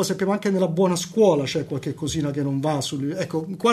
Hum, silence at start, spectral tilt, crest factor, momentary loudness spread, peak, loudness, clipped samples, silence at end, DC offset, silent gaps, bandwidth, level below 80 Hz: none; 0 s; -5.5 dB/octave; 18 dB; 8 LU; -4 dBFS; -23 LUFS; under 0.1%; 0 s; under 0.1%; none; 13.5 kHz; -56 dBFS